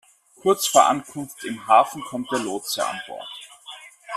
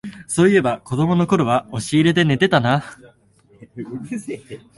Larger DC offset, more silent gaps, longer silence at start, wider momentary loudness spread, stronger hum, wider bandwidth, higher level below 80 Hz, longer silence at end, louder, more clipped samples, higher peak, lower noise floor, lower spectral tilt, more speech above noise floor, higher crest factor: neither; neither; first, 0.45 s vs 0.05 s; first, 21 LU vs 17 LU; neither; first, 15.5 kHz vs 11.5 kHz; second, -68 dBFS vs -52 dBFS; second, 0 s vs 0.2 s; second, -21 LUFS vs -18 LUFS; neither; about the same, -2 dBFS vs -2 dBFS; second, -43 dBFS vs -54 dBFS; second, -2.5 dB/octave vs -6 dB/octave; second, 22 dB vs 36 dB; about the same, 22 dB vs 18 dB